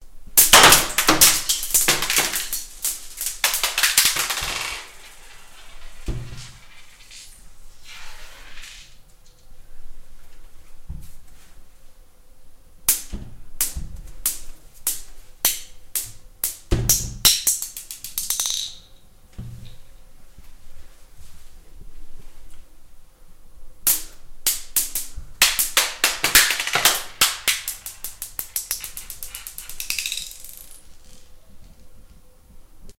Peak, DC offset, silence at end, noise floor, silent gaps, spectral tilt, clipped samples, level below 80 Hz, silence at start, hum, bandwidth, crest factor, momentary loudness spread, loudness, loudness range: 0 dBFS; under 0.1%; 0.05 s; -47 dBFS; none; 0 dB/octave; under 0.1%; -40 dBFS; 0 s; none; 17 kHz; 24 dB; 25 LU; -19 LUFS; 20 LU